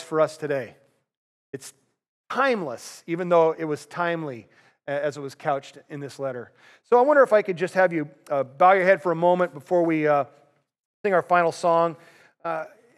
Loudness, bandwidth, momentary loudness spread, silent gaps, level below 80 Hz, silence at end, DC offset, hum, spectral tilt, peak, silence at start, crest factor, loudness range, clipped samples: -23 LUFS; 13 kHz; 19 LU; 1.17-1.53 s, 2.08-2.24 s, 10.79-11.04 s; -86 dBFS; 0.3 s; under 0.1%; none; -6 dB/octave; -4 dBFS; 0 s; 20 dB; 7 LU; under 0.1%